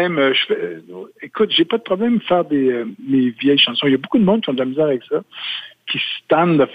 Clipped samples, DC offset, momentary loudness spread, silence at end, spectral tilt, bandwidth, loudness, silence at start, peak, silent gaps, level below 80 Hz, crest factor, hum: under 0.1%; under 0.1%; 11 LU; 0 s; -7.5 dB/octave; 5 kHz; -17 LUFS; 0 s; -2 dBFS; none; -60 dBFS; 16 dB; none